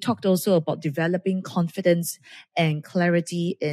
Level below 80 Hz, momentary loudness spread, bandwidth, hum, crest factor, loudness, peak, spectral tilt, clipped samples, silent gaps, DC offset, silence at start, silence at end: -72 dBFS; 6 LU; 15 kHz; none; 14 dB; -24 LUFS; -8 dBFS; -6 dB/octave; under 0.1%; none; under 0.1%; 0 s; 0 s